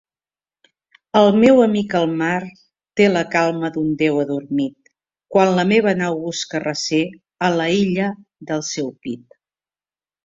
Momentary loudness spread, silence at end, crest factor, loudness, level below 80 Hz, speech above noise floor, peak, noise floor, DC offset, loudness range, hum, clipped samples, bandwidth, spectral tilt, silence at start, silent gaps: 13 LU; 1.05 s; 18 dB; -18 LUFS; -60 dBFS; over 73 dB; 0 dBFS; under -90 dBFS; under 0.1%; 5 LU; none; under 0.1%; 7.8 kHz; -5.5 dB/octave; 1.15 s; none